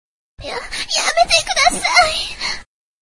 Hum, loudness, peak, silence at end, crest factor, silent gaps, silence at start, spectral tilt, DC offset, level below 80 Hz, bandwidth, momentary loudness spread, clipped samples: none; -15 LUFS; 0 dBFS; 0.4 s; 18 dB; none; 0.4 s; 0 dB/octave; under 0.1%; -40 dBFS; 11.5 kHz; 15 LU; under 0.1%